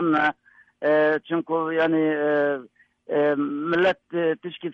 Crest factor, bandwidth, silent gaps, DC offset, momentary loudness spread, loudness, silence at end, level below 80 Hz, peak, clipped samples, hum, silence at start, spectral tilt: 12 dB; 6.2 kHz; none; under 0.1%; 6 LU; -23 LUFS; 0 s; -68 dBFS; -10 dBFS; under 0.1%; none; 0 s; -7.5 dB/octave